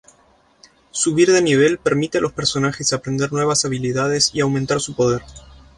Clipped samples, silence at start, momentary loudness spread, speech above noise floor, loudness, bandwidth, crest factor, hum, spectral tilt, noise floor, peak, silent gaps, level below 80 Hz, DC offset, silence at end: under 0.1%; 0.95 s; 7 LU; 37 dB; -18 LUFS; 11.5 kHz; 18 dB; none; -4 dB/octave; -55 dBFS; -2 dBFS; none; -50 dBFS; under 0.1%; 0.35 s